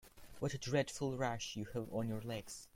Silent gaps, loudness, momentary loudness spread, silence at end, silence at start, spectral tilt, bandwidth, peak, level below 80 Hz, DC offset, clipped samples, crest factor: none; -41 LUFS; 8 LU; 0.1 s; 0.05 s; -5 dB/octave; 16.5 kHz; -22 dBFS; -64 dBFS; under 0.1%; under 0.1%; 20 dB